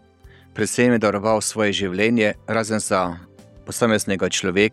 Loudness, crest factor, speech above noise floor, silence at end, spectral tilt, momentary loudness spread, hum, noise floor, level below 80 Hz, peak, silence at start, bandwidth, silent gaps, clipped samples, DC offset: -20 LUFS; 18 dB; 29 dB; 0 s; -4 dB/octave; 9 LU; none; -49 dBFS; -54 dBFS; -2 dBFS; 0.25 s; 13.5 kHz; none; under 0.1%; under 0.1%